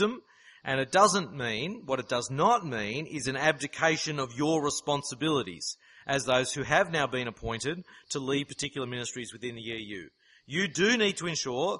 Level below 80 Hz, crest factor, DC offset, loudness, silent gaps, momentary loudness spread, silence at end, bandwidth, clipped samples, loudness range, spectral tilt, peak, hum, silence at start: -60 dBFS; 22 dB; under 0.1%; -29 LUFS; none; 12 LU; 0 s; 11.5 kHz; under 0.1%; 6 LU; -3.5 dB/octave; -8 dBFS; none; 0 s